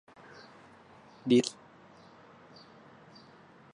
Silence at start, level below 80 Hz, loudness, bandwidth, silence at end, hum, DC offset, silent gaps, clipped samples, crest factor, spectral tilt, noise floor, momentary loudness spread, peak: 1.25 s; -78 dBFS; -29 LUFS; 11 kHz; 2.25 s; none; under 0.1%; none; under 0.1%; 22 dB; -5 dB/octave; -57 dBFS; 29 LU; -14 dBFS